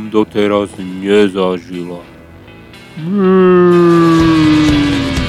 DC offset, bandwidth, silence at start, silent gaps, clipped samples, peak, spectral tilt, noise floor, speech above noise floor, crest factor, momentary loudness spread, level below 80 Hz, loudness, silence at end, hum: under 0.1%; 12 kHz; 0 s; none; under 0.1%; 0 dBFS; -7 dB/octave; -36 dBFS; 25 dB; 12 dB; 17 LU; -32 dBFS; -11 LUFS; 0 s; none